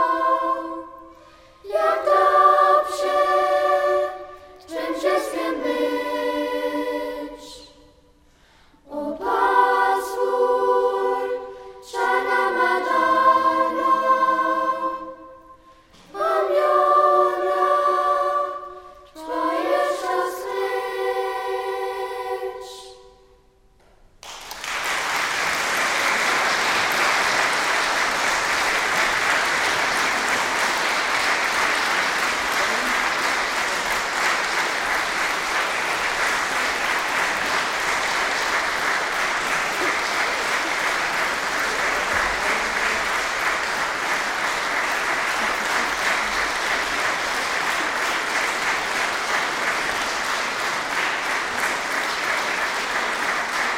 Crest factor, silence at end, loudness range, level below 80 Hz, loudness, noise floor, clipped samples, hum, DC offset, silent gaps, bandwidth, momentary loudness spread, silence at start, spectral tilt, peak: 18 dB; 0 s; 6 LU; -52 dBFS; -21 LUFS; -55 dBFS; under 0.1%; none; under 0.1%; none; 16.5 kHz; 9 LU; 0 s; -1 dB/octave; -4 dBFS